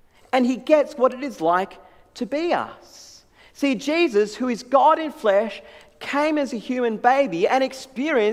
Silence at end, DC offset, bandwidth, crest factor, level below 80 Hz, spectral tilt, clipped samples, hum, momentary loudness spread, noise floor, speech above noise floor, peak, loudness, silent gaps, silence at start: 0 s; under 0.1%; 14.5 kHz; 18 dB; -62 dBFS; -4.5 dB/octave; under 0.1%; none; 10 LU; -50 dBFS; 29 dB; -4 dBFS; -21 LUFS; none; 0.35 s